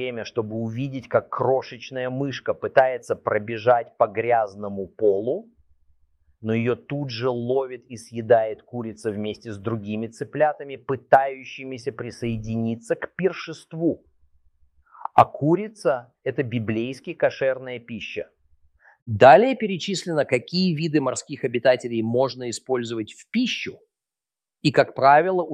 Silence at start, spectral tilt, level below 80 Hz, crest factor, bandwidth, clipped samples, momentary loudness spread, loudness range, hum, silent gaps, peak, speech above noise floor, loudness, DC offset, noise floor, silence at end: 0 s; -6 dB/octave; -60 dBFS; 22 dB; 11.5 kHz; under 0.1%; 13 LU; 6 LU; none; 19.02-19.06 s; -2 dBFS; over 67 dB; -23 LUFS; under 0.1%; under -90 dBFS; 0 s